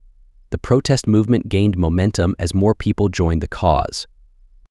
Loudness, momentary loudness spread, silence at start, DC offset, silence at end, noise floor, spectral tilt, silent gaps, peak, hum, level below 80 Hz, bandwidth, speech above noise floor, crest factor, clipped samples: -18 LUFS; 11 LU; 0.5 s; under 0.1%; 0.65 s; -48 dBFS; -6.5 dB/octave; none; -2 dBFS; none; -32 dBFS; 12 kHz; 31 dB; 16 dB; under 0.1%